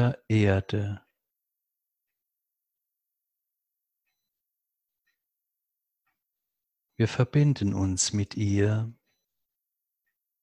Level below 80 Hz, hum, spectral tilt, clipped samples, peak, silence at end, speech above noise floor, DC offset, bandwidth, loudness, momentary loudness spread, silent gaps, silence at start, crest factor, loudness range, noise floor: -50 dBFS; none; -5.5 dB/octave; under 0.1%; -8 dBFS; 1.5 s; 60 dB; under 0.1%; 11 kHz; -26 LUFS; 8 LU; none; 0 s; 22 dB; 10 LU; -85 dBFS